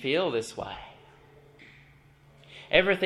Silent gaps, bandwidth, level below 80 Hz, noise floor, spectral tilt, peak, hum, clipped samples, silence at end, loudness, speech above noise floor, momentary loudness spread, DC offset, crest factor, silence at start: none; 12.5 kHz; -56 dBFS; -57 dBFS; -4.5 dB/octave; -4 dBFS; none; under 0.1%; 0 s; -27 LUFS; 31 dB; 26 LU; under 0.1%; 26 dB; 0 s